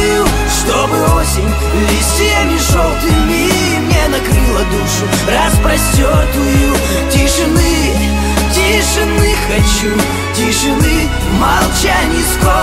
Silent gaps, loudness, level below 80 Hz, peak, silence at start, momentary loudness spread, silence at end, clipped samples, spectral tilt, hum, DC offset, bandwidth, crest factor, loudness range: none; -12 LUFS; -16 dBFS; 0 dBFS; 0 s; 3 LU; 0 s; under 0.1%; -4 dB/octave; none; under 0.1%; 16.5 kHz; 12 dB; 1 LU